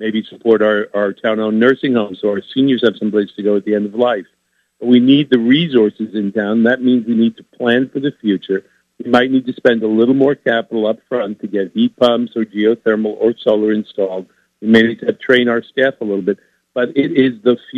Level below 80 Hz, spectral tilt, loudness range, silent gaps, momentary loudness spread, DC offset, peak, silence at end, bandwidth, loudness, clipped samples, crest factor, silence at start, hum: -62 dBFS; -7.5 dB/octave; 2 LU; none; 9 LU; under 0.1%; 0 dBFS; 0 s; 6.6 kHz; -15 LUFS; under 0.1%; 14 dB; 0 s; none